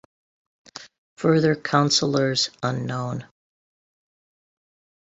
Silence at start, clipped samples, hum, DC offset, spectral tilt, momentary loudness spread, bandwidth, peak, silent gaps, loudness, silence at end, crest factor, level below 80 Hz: 0.8 s; under 0.1%; none; under 0.1%; -4.5 dB/octave; 22 LU; 8.2 kHz; -2 dBFS; 0.98-1.17 s; -22 LUFS; 1.8 s; 22 dB; -62 dBFS